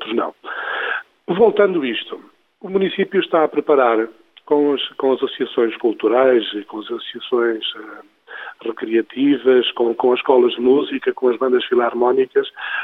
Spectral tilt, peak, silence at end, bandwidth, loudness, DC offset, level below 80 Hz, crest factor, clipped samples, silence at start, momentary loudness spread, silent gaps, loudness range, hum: -7.5 dB/octave; -2 dBFS; 0 s; 4.1 kHz; -18 LUFS; under 0.1%; -68 dBFS; 16 dB; under 0.1%; 0 s; 13 LU; none; 4 LU; none